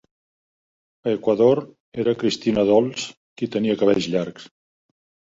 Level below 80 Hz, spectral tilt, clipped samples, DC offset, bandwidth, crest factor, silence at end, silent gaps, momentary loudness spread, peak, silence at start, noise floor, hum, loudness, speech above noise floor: -58 dBFS; -5.5 dB/octave; under 0.1%; under 0.1%; 8 kHz; 18 dB; 0.85 s; 1.80-1.92 s, 3.17-3.36 s; 13 LU; -4 dBFS; 1.05 s; under -90 dBFS; none; -21 LUFS; over 70 dB